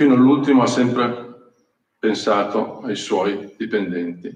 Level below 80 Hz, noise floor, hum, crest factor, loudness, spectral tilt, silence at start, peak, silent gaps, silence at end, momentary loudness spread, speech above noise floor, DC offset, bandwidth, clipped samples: -68 dBFS; -65 dBFS; none; 16 dB; -19 LUFS; -5.5 dB/octave; 0 s; -2 dBFS; none; 0 s; 12 LU; 47 dB; under 0.1%; 9.2 kHz; under 0.1%